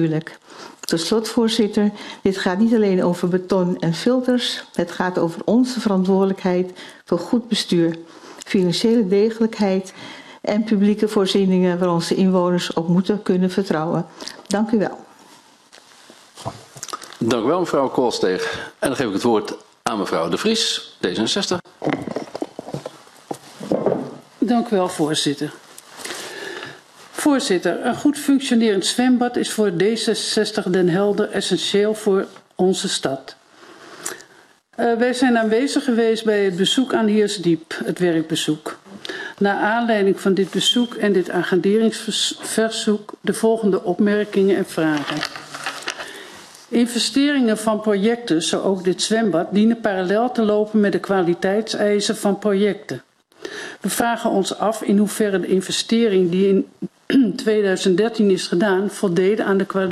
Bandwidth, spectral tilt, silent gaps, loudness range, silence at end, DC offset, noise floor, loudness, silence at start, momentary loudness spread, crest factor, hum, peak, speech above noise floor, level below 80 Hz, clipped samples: 13.5 kHz; -5 dB/octave; none; 5 LU; 0 s; under 0.1%; -51 dBFS; -19 LUFS; 0 s; 14 LU; 18 dB; none; -2 dBFS; 32 dB; -62 dBFS; under 0.1%